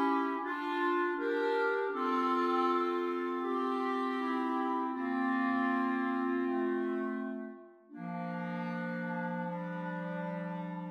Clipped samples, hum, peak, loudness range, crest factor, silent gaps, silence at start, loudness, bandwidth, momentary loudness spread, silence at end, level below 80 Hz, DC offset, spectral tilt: under 0.1%; none; -20 dBFS; 7 LU; 14 dB; none; 0 s; -34 LUFS; 8.2 kHz; 8 LU; 0 s; -88 dBFS; under 0.1%; -7.5 dB/octave